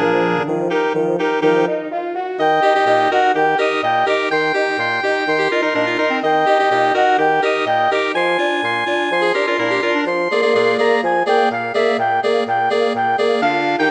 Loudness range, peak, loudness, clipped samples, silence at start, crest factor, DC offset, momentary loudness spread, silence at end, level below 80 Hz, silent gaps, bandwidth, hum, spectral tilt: 1 LU; -2 dBFS; -16 LUFS; under 0.1%; 0 s; 14 dB; under 0.1%; 4 LU; 0 s; -68 dBFS; none; 9.4 kHz; none; -4.5 dB/octave